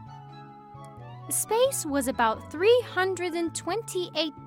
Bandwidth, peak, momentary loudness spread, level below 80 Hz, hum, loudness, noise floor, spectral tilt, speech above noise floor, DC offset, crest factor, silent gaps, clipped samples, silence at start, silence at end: 16.5 kHz; -10 dBFS; 23 LU; -60 dBFS; none; -26 LUFS; -46 dBFS; -3 dB/octave; 19 dB; under 0.1%; 16 dB; none; under 0.1%; 0 s; 0 s